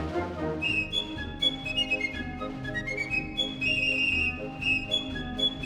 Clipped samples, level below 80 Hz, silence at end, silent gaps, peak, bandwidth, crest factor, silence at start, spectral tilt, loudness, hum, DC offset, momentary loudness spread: under 0.1%; -46 dBFS; 0 s; none; -14 dBFS; 17.5 kHz; 16 dB; 0 s; -4 dB/octave; -28 LUFS; none; under 0.1%; 9 LU